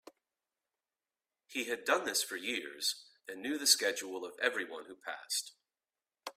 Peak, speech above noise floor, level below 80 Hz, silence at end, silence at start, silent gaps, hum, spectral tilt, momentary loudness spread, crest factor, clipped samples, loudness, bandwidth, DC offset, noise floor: -12 dBFS; over 54 dB; -86 dBFS; 0.05 s; 1.5 s; none; none; 0.5 dB/octave; 17 LU; 26 dB; under 0.1%; -34 LUFS; 16 kHz; under 0.1%; under -90 dBFS